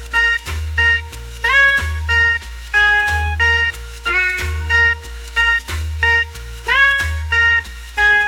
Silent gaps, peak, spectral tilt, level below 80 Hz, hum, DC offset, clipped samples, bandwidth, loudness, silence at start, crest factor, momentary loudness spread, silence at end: none; -2 dBFS; -2.5 dB/octave; -30 dBFS; none; under 0.1%; under 0.1%; 18 kHz; -15 LUFS; 0 s; 14 dB; 10 LU; 0 s